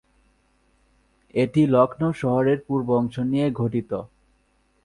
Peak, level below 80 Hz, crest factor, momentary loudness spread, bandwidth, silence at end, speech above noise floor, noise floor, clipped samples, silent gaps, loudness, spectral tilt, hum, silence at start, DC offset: -4 dBFS; -56 dBFS; 20 dB; 9 LU; 11 kHz; 0.8 s; 43 dB; -65 dBFS; under 0.1%; none; -22 LUFS; -8.5 dB/octave; none; 1.35 s; under 0.1%